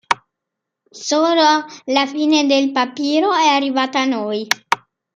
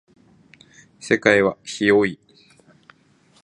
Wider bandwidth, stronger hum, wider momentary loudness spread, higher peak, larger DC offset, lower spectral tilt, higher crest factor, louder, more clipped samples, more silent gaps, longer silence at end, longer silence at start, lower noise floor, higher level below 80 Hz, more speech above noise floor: first, 15.5 kHz vs 11 kHz; neither; second, 8 LU vs 17 LU; about the same, 0 dBFS vs -2 dBFS; neither; second, -2 dB/octave vs -5 dB/octave; about the same, 18 dB vs 22 dB; about the same, -17 LUFS vs -19 LUFS; neither; neither; second, 0.4 s vs 1.3 s; second, 0.1 s vs 1.05 s; first, -81 dBFS vs -57 dBFS; second, -66 dBFS vs -60 dBFS; first, 64 dB vs 38 dB